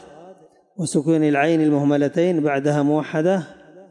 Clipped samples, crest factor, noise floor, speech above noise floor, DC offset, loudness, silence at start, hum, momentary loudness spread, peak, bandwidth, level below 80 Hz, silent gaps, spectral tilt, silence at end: under 0.1%; 12 dB; -48 dBFS; 29 dB; under 0.1%; -19 LUFS; 0.2 s; none; 6 LU; -8 dBFS; 11.5 kHz; -72 dBFS; none; -6.5 dB/octave; 0.1 s